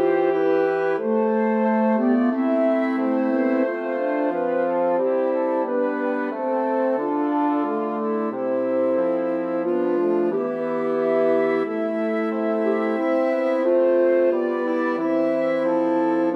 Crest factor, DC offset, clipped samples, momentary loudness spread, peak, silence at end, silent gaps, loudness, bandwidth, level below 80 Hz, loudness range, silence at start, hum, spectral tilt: 12 dB; under 0.1%; under 0.1%; 5 LU; -10 dBFS; 0 s; none; -22 LUFS; 6 kHz; -86 dBFS; 2 LU; 0 s; none; -8.5 dB/octave